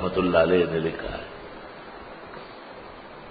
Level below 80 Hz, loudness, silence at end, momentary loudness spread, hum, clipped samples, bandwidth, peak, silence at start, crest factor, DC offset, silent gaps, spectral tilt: -48 dBFS; -24 LUFS; 0 s; 21 LU; none; under 0.1%; 5 kHz; -4 dBFS; 0 s; 22 dB; under 0.1%; none; -10.5 dB/octave